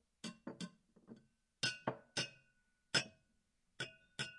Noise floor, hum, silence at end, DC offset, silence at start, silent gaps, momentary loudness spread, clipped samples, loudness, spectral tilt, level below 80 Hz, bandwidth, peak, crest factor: -80 dBFS; none; 0 s; under 0.1%; 0.25 s; none; 24 LU; under 0.1%; -43 LUFS; -2.5 dB/octave; -82 dBFS; 11.5 kHz; -18 dBFS; 28 dB